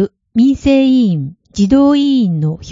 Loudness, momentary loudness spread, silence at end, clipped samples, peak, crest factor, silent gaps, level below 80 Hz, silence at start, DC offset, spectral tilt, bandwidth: -12 LUFS; 8 LU; 0 s; under 0.1%; 0 dBFS; 12 dB; none; -38 dBFS; 0 s; under 0.1%; -7.5 dB/octave; 7.6 kHz